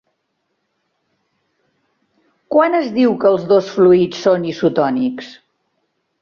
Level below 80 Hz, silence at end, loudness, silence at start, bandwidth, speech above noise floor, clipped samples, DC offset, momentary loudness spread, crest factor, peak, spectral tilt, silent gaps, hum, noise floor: -62 dBFS; 0.9 s; -15 LUFS; 2.5 s; 7 kHz; 56 dB; under 0.1%; under 0.1%; 8 LU; 16 dB; -2 dBFS; -7 dB/octave; none; none; -70 dBFS